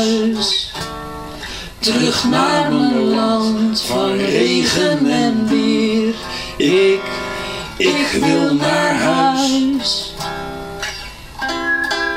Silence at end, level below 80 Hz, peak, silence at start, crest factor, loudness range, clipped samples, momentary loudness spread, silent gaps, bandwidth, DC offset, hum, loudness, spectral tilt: 0 s; -42 dBFS; -2 dBFS; 0 s; 14 dB; 2 LU; under 0.1%; 11 LU; none; 16 kHz; under 0.1%; none; -16 LUFS; -4 dB/octave